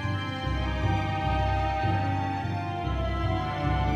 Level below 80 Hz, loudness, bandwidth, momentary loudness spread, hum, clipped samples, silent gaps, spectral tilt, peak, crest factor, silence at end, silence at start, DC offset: -34 dBFS; -28 LUFS; 7.6 kHz; 4 LU; none; under 0.1%; none; -7 dB/octave; -14 dBFS; 14 dB; 0 s; 0 s; under 0.1%